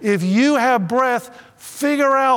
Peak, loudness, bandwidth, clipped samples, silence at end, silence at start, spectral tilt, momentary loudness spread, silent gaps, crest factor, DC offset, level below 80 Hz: -4 dBFS; -17 LUFS; 19.5 kHz; under 0.1%; 0 s; 0 s; -5.5 dB/octave; 9 LU; none; 12 dB; under 0.1%; -70 dBFS